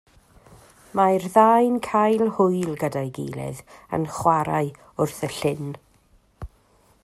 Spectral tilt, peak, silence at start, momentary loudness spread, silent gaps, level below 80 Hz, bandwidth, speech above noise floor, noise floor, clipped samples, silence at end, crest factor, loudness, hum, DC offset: -6.5 dB/octave; -2 dBFS; 0.95 s; 21 LU; none; -52 dBFS; 14.5 kHz; 37 dB; -59 dBFS; under 0.1%; 0.55 s; 22 dB; -22 LUFS; none; under 0.1%